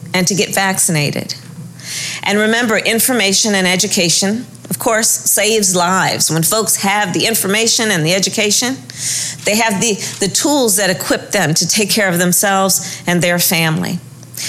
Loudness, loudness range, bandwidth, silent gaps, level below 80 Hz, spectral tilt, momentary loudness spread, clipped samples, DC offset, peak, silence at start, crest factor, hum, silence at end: -13 LUFS; 2 LU; 16.5 kHz; none; -52 dBFS; -2.5 dB/octave; 8 LU; under 0.1%; under 0.1%; -2 dBFS; 0 s; 12 dB; none; 0 s